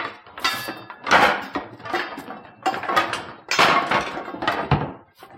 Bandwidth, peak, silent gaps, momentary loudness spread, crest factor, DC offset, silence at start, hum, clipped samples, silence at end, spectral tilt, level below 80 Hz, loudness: 16.5 kHz; -4 dBFS; none; 16 LU; 20 dB; under 0.1%; 0 s; none; under 0.1%; 0 s; -3.5 dB/octave; -48 dBFS; -22 LUFS